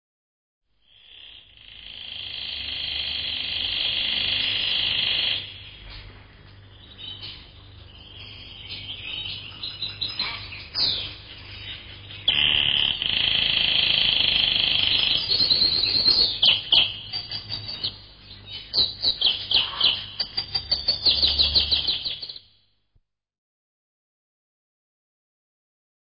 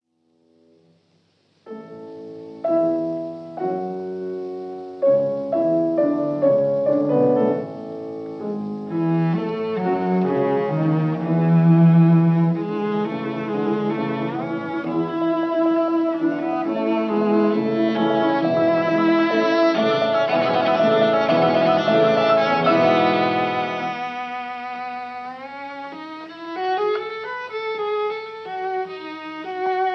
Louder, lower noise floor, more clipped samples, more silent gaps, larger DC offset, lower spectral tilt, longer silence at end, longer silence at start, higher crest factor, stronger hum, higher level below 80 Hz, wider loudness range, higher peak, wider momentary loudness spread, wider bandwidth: about the same, -21 LUFS vs -20 LUFS; about the same, -67 dBFS vs -64 dBFS; neither; neither; neither; second, -6 dB/octave vs -8.5 dB/octave; first, 3.7 s vs 0 s; second, 1.1 s vs 1.65 s; about the same, 20 dB vs 16 dB; neither; first, -48 dBFS vs -74 dBFS; first, 15 LU vs 9 LU; about the same, -6 dBFS vs -6 dBFS; first, 20 LU vs 15 LU; second, 5.4 kHz vs 6.2 kHz